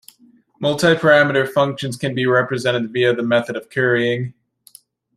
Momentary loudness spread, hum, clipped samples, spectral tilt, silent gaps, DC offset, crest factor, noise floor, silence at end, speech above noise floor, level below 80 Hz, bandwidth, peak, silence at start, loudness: 11 LU; none; under 0.1%; -5.5 dB/octave; none; under 0.1%; 18 dB; -53 dBFS; 0.85 s; 36 dB; -60 dBFS; 15.5 kHz; -2 dBFS; 0.6 s; -17 LUFS